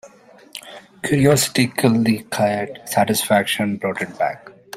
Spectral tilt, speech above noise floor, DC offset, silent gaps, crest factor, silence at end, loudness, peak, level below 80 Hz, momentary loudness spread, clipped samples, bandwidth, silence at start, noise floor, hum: -4.5 dB/octave; 27 dB; under 0.1%; none; 18 dB; 0 s; -19 LUFS; -2 dBFS; -54 dBFS; 20 LU; under 0.1%; 16 kHz; 0.05 s; -46 dBFS; none